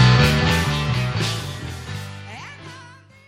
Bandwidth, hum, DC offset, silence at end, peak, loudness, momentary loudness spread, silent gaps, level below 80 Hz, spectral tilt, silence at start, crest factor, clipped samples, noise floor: 15.5 kHz; none; under 0.1%; 0.35 s; -2 dBFS; -20 LUFS; 21 LU; none; -34 dBFS; -5 dB/octave; 0 s; 18 dB; under 0.1%; -44 dBFS